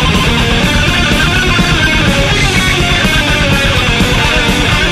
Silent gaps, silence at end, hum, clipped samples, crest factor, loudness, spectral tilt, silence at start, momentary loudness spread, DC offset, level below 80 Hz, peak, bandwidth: none; 0 s; none; under 0.1%; 10 dB; -9 LUFS; -4 dB/octave; 0 s; 1 LU; under 0.1%; -18 dBFS; 0 dBFS; 14 kHz